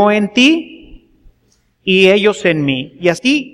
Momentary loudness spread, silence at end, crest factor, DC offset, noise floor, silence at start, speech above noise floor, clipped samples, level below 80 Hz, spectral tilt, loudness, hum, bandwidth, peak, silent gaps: 9 LU; 0.05 s; 14 dB; under 0.1%; -58 dBFS; 0 s; 45 dB; under 0.1%; -48 dBFS; -5 dB/octave; -13 LUFS; none; 12 kHz; 0 dBFS; none